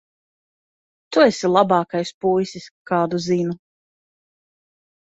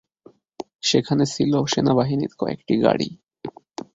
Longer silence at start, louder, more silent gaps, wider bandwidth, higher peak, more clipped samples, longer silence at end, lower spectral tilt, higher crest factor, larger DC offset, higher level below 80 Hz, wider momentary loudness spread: first, 1.1 s vs 0.6 s; about the same, -20 LUFS vs -21 LUFS; first, 2.14-2.21 s, 2.71-2.85 s vs 0.75-0.79 s; about the same, 8 kHz vs 7.8 kHz; about the same, -2 dBFS vs -2 dBFS; neither; first, 1.45 s vs 0.45 s; about the same, -5.5 dB/octave vs -5.5 dB/octave; about the same, 20 dB vs 20 dB; neither; second, -64 dBFS vs -56 dBFS; second, 12 LU vs 18 LU